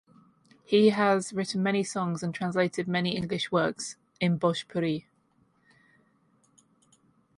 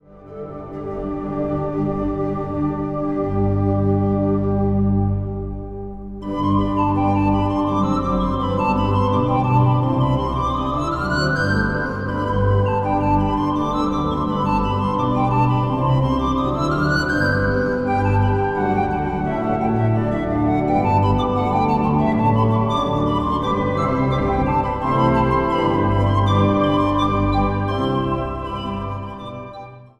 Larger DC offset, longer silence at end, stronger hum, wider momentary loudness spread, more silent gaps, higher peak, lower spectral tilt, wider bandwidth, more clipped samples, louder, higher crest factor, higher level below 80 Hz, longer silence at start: neither; first, 2.4 s vs 0.15 s; second, none vs 50 Hz at -35 dBFS; about the same, 9 LU vs 9 LU; neither; second, -10 dBFS vs -4 dBFS; second, -5.5 dB/octave vs -8 dB/octave; first, 11.5 kHz vs 8.2 kHz; neither; second, -28 LUFS vs -19 LUFS; first, 20 dB vs 14 dB; second, -68 dBFS vs -34 dBFS; first, 0.7 s vs 0.1 s